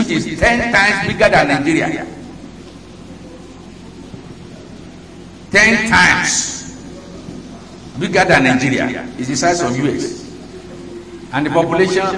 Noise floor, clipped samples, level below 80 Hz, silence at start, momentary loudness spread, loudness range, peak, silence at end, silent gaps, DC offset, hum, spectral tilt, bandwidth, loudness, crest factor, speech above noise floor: -35 dBFS; under 0.1%; -40 dBFS; 0 s; 25 LU; 9 LU; 0 dBFS; 0 s; none; 0.2%; none; -4 dB/octave; 11 kHz; -14 LUFS; 16 dB; 21 dB